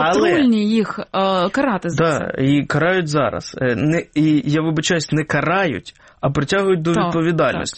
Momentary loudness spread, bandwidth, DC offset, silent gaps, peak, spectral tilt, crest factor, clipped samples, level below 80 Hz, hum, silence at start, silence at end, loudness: 6 LU; 8.8 kHz; under 0.1%; none; -6 dBFS; -5.5 dB/octave; 12 dB; under 0.1%; -48 dBFS; none; 0 s; 0 s; -18 LUFS